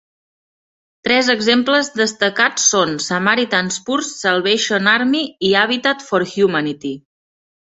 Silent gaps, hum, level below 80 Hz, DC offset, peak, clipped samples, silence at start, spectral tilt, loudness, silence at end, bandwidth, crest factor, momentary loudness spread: none; none; -60 dBFS; under 0.1%; 0 dBFS; under 0.1%; 1.05 s; -2.5 dB/octave; -16 LUFS; 0.8 s; 8.2 kHz; 16 dB; 7 LU